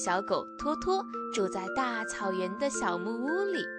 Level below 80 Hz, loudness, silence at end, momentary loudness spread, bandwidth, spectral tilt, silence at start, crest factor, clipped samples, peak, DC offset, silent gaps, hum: -60 dBFS; -32 LUFS; 0 s; 3 LU; 10.5 kHz; -3.5 dB/octave; 0 s; 16 dB; under 0.1%; -16 dBFS; under 0.1%; none; none